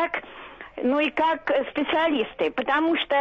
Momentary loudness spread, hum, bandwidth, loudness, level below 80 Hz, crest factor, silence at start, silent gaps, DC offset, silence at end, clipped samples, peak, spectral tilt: 12 LU; none; 7.2 kHz; -24 LUFS; -58 dBFS; 12 dB; 0 s; none; under 0.1%; 0 s; under 0.1%; -12 dBFS; -5.5 dB/octave